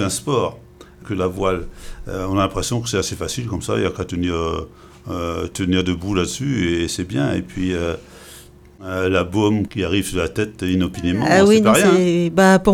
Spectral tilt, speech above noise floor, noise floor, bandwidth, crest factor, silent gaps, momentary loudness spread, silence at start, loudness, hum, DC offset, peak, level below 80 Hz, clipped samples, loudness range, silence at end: -5 dB/octave; 24 dB; -43 dBFS; 17 kHz; 18 dB; none; 15 LU; 0 s; -19 LUFS; none; under 0.1%; 0 dBFS; -40 dBFS; under 0.1%; 6 LU; 0 s